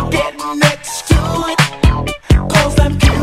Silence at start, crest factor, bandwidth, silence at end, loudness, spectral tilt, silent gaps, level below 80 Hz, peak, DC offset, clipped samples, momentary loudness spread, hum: 0 s; 12 dB; 15.5 kHz; 0 s; -14 LUFS; -5 dB/octave; none; -18 dBFS; 0 dBFS; under 0.1%; 0.1%; 6 LU; none